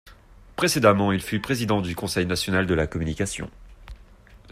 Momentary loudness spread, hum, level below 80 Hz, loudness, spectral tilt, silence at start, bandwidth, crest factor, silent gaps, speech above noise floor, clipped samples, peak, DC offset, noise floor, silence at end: 10 LU; none; -44 dBFS; -23 LUFS; -5 dB/octave; 0.05 s; 16 kHz; 20 dB; none; 26 dB; under 0.1%; -4 dBFS; under 0.1%; -49 dBFS; 0 s